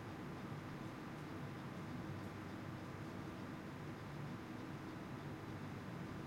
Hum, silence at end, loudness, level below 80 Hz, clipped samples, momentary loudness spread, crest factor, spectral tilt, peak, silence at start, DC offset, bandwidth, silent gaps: none; 0 s; -49 LUFS; -68 dBFS; under 0.1%; 1 LU; 14 dB; -6.5 dB/octave; -36 dBFS; 0 s; under 0.1%; 16 kHz; none